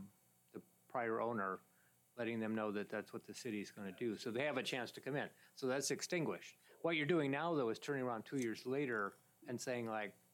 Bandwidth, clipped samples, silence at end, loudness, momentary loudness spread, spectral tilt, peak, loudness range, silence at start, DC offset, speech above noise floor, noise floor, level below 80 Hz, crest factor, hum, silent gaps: 18.5 kHz; under 0.1%; 0.2 s; -42 LUFS; 12 LU; -4.5 dB/octave; -24 dBFS; 4 LU; 0 s; under 0.1%; 26 dB; -67 dBFS; under -90 dBFS; 18 dB; none; none